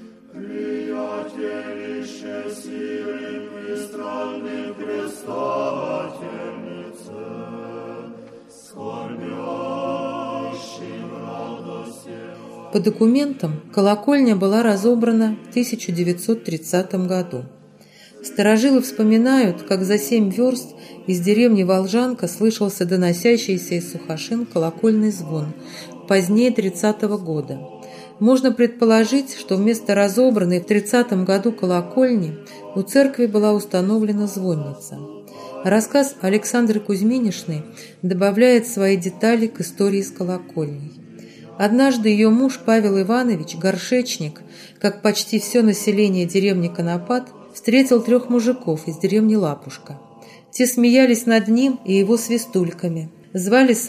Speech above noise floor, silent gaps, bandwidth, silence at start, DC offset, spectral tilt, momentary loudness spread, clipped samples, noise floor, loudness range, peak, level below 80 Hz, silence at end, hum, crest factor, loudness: 29 dB; none; 15.5 kHz; 0 s; under 0.1%; -5.5 dB/octave; 17 LU; under 0.1%; -47 dBFS; 11 LU; -2 dBFS; -70 dBFS; 0 s; none; 18 dB; -19 LUFS